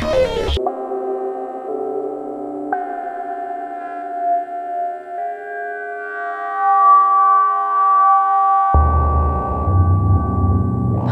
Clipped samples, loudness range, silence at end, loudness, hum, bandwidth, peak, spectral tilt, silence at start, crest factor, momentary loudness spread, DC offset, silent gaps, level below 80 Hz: under 0.1%; 11 LU; 0 s; -18 LUFS; none; 8 kHz; -2 dBFS; -8 dB/octave; 0 s; 14 dB; 14 LU; under 0.1%; none; -26 dBFS